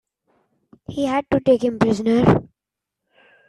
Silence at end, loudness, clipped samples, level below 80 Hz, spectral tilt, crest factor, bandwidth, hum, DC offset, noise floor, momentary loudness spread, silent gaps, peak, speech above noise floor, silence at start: 1.05 s; -19 LUFS; under 0.1%; -48 dBFS; -7.5 dB/octave; 18 dB; 11 kHz; none; under 0.1%; -85 dBFS; 7 LU; none; -2 dBFS; 67 dB; 0.9 s